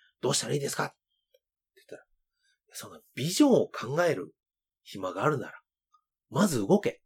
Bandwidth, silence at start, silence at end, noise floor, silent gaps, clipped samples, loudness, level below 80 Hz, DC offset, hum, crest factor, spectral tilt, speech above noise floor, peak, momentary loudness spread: 18.5 kHz; 0.25 s; 0.1 s; -75 dBFS; none; under 0.1%; -28 LUFS; -68 dBFS; under 0.1%; none; 20 dB; -4.5 dB/octave; 47 dB; -10 dBFS; 20 LU